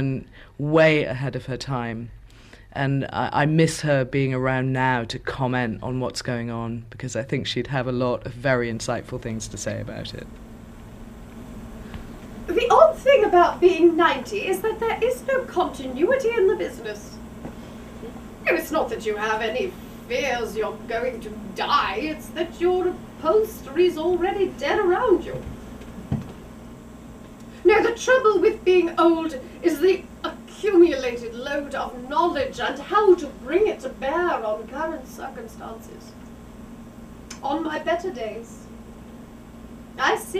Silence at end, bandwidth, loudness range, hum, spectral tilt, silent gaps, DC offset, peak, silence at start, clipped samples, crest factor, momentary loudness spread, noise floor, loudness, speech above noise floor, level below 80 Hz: 0 s; 15 kHz; 11 LU; none; -5.5 dB/octave; none; under 0.1%; -2 dBFS; 0 s; under 0.1%; 22 dB; 24 LU; -46 dBFS; -22 LUFS; 24 dB; -46 dBFS